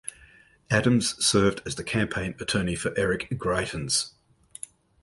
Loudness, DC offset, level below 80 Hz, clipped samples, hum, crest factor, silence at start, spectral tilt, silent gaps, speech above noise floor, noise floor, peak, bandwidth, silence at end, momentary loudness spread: -25 LUFS; under 0.1%; -48 dBFS; under 0.1%; none; 20 dB; 0.05 s; -4 dB/octave; none; 30 dB; -56 dBFS; -8 dBFS; 12 kHz; 0.95 s; 18 LU